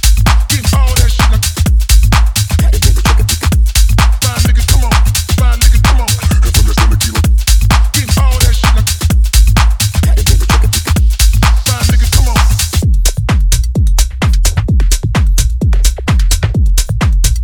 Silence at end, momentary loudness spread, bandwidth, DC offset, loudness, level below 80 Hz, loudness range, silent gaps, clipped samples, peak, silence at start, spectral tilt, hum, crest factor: 0 s; 3 LU; 19 kHz; under 0.1%; -11 LUFS; -10 dBFS; 2 LU; none; 0.4%; 0 dBFS; 0.05 s; -4 dB/octave; none; 8 dB